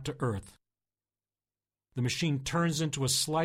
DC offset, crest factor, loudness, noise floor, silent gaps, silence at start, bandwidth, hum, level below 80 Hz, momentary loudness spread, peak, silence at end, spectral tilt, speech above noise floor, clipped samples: under 0.1%; 16 dB; -31 LUFS; under -90 dBFS; none; 0 s; 16 kHz; 50 Hz at -60 dBFS; -58 dBFS; 8 LU; -16 dBFS; 0 s; -4 dB/octave; over 59 dB; under 0.1%